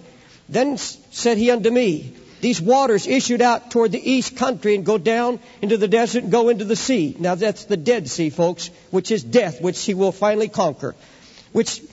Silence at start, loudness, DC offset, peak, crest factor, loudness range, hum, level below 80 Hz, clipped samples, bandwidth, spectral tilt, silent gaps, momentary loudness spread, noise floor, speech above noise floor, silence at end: 0.5 s; -19 LUFS; under 0.1%; -4 dBFS; 16 dB; 3 LU; none; -58 dBFS; under 0.1%; 8 kHz; -4.5 dB/octave; none; 7 LU; -46 dBFS; 27 dB; 0.05 s